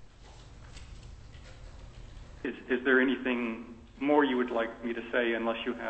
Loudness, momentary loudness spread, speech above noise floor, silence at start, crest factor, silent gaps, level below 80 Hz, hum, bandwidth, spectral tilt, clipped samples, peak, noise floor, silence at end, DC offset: -30 LUFS; 25 LU; 22 dB; 0 s; 22 dB; none; -52 dBFS; none; 8.6 kHz; -6 dB/octave; under 0.1%; -10 dBFS; -51 dBFS; 0 s; under 0.1%